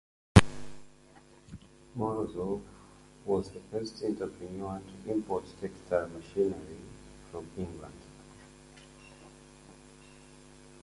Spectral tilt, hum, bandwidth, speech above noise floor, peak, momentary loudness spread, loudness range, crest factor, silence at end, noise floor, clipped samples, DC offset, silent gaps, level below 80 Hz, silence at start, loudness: -6.5 dB/octave; none; 11.5 kHz; 23 dB; 0 dBFS; 22 LU; 12 LU; 34 dB; 0.05 s; -58 dBFS; under 0.1%; under 0.1%; none; -46 dBFS; 0.35 s; -32 LUFS